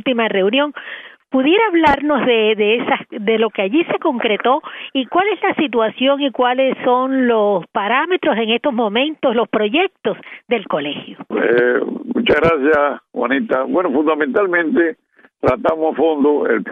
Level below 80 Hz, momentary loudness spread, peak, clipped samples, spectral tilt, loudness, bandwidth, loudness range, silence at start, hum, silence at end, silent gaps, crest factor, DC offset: -50 dBFS; 8 LU; -2 dBFS; under 0.1%; -7 dB/octave; -16 LUFS; 5.2 kHz; 2 LU; 0.05 s; none; 0 s; none; 14 dB; under 0.1%